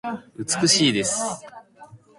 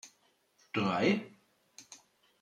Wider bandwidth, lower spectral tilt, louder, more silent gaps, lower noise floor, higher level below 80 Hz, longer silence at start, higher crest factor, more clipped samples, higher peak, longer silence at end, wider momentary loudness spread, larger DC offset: about the same, 11.5 kHz vs 11 kHz; second, -2.5 dB/octave vs -5.5 dB/octave; first, -20 LUFS vs -32 LUFS; neither; second, -48 dBFS vs -71 dBFS; first, -60 dBFS vs -76 dBFS; about the same, 0.05 s vs 0.05 s; about the same, 20 dB vs 20 dB; neither; first, -4 dBFS vs -16 dBFS; second, 0.25 s vs 0.45 s; second, 16 LU vs 26 LU; neither